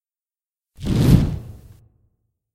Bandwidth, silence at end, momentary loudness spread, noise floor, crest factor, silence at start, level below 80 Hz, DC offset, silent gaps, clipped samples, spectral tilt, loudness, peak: 15 kHz; 1 s; 18 LU; under -90 dBFS; 22 dB; 0.8 s; -30 dBFS; under 0.1%; none; under 0.1%; -7.5 dB/octave; -18 LUFS; 0 dBFS